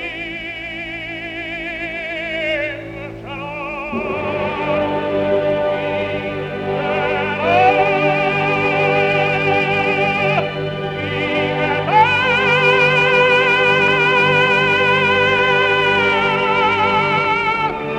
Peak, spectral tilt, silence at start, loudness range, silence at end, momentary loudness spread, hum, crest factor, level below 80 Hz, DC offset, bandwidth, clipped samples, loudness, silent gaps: 0 dBFS; -5.5 dB/octave; 0 s; 10 LU; 0 s; 13 LU; none; 16 dB; -46 dBFS; under 0.1%; 11 kHz; under 0.1%; -16 LUFS; none